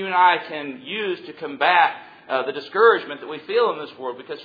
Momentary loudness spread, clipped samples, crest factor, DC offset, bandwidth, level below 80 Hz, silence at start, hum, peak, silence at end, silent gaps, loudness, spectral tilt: 16 LU; under 0.1%; 20 dB; under 0.1%; 5 kHz; -74 dBFS; 0 s; none; -2 dBFS; 0 s; none; -21 LUFS; -6 dB/octave